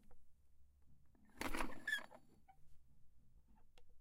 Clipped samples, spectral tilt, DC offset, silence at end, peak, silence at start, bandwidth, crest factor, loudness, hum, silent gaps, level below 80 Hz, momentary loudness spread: under 0.1%; -3 dB/octave; under 0.1%; 0 s; -26 dBFS; 0 s; 16 kHz; 24 dB; -45 LUFS; none; none; -58 dBFS; 7 LU